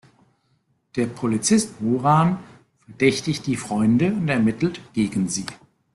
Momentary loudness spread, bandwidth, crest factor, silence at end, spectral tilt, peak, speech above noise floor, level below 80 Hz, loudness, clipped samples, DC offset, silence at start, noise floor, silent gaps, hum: 8 LU; 12.5 kHz; 18 dB; 0.4 s; -5.5 dB/octave; -6 dBFS; 46 dB; -56 dBFS; -22 LUFS; under 0.1%; under 0.1%; 0.95 s; -67 dBFS; none; none